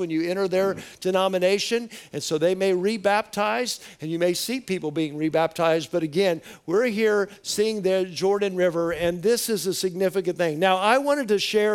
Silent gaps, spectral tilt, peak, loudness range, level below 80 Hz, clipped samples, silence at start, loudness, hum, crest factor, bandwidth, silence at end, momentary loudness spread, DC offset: none; -4 dB/octave; -6 dBFS; 2 LU; -62 dBFS; under 0.1%; 0 s; -24 LUFS; none; 16 dB; 18.5 kHz; 0 s; 6 LU; under 0.1%